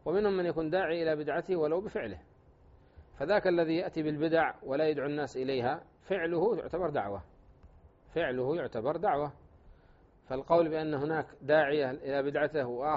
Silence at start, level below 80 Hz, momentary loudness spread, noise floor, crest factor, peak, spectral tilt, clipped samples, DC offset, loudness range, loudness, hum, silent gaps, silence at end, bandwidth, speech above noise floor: 0.05 s; -60 dBFS; 11 LU; -61 dBFS; 20 dB; -12 dBFS; -4.5 dB/octave; under 0.1%; under 0.1%; 3 LU; -31 LUFS; none; none; 0 s; 7.6 kHz; 30 dB